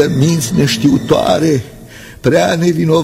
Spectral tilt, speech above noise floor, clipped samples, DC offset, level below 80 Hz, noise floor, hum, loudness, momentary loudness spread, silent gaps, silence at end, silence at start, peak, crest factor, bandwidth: -5.5 dB/octave; 22 dB; under 0.1%; under 0.1%; -40 dBFS; -34 dBFS; none; -13 LUFS; 6 LU; none; 0 s; 0 s; 0 dBFS; 12 dB; 16 kHz